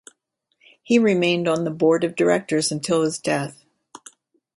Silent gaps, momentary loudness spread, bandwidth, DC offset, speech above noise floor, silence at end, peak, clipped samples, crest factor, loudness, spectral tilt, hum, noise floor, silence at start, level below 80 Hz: none; 6 LU; 11.5 kHz; under 0.1%; 51 dB; 0.6 s; -4 dBFS; under 0.1%; 18 dB; -20 LUFS; -4.5 dB/octave; none; -71 dBFS; 0.9 s; -66 dBFS